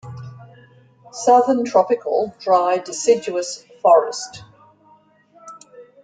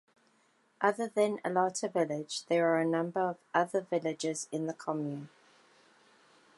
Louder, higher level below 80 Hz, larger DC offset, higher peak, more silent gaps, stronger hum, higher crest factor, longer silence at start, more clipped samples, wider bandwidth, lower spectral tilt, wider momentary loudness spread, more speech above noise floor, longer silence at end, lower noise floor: first, -18 LUFS vs -32 LUFS; first, -66 dBFS vs -88 dBFS; neither; first, -2 dBFS vs -12 dBFS; neither; neither; about the same, 18 dB vs 20 dB; second, 0.05 s vs 0.8 s; neither; second, 9.4 kHz vs 11.5 kHz; about the same, -4 dB/octave vs -4.5 dB/octave; first, 20 LU vs 8 LU; about the same, 36 dB vs 38 dB; second, 0.2 s vs 1.3 s; second, -54 dBFS vs -70 dBFS